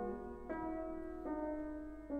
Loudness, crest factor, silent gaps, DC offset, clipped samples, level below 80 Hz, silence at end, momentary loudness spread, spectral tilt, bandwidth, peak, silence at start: -44 LUFS; 12 dB; none; under 0.1%; under 0.1%; -56 dBFS; 0 s; 5 LU; -9 dB/octave; 8.4 kHz; -30 dBFS; 0 s